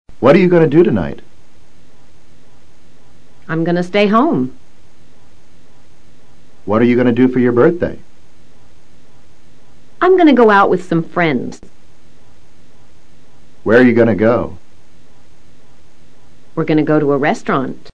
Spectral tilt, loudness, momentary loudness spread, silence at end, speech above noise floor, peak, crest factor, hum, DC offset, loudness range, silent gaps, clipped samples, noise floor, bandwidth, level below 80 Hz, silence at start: -8 dB/octave; -13 LUFS; 14 LU; 0 s; 37 dB; 0 dBFS; 16 dB; none; 5%; 5 LU; none; 0.1%; -49 dBFS; 9 kHz; -48 dBFS; 0.05 s